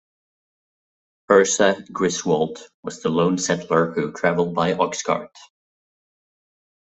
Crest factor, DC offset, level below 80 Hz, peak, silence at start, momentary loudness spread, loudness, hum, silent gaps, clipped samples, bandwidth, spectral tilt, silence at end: 20 dB; under 0.1%; -62 dBFS; -2 dBFS; 1.3 s; 9 LU; -21 LUFS; none; 2.74-2.83 s; under 0.1%; 8.4 kHz; -4 dB/octave; 1.65 s